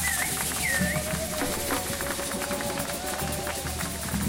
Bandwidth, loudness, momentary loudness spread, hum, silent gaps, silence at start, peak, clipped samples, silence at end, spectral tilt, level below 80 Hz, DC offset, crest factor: 16 kHz; -28 LUFS; 5 LU; none; none; 0 s; -12 dBFS; under 0.1%; 0 s; -3 dB/octave; -42 dBFS; under 0.1%; 16 dB